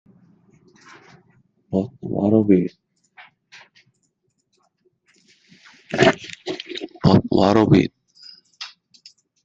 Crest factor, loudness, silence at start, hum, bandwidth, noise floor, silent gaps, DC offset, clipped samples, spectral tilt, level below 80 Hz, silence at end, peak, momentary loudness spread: 22 dB; -19 LUFS; 1.7 s; none; 8 kHz; -70 dBFS; none; under 0.1%; under 0.1%; -7 dB/octave; -52 dBFS; 0.8 s; -2 dBFS; 17 LU